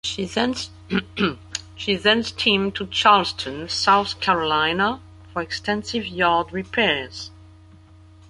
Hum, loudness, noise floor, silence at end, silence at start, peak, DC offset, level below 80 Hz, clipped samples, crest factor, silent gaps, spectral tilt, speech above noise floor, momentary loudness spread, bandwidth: none; -21 LUFS; -48 dBFS; 0.85 s; 0.05 s; -2 dBFS; under 0.1%; -48 dBFS; under 0.1%; 20 dB; none; -3.5 dB/octave; 26 dB; 13 LU; 11.5 kHz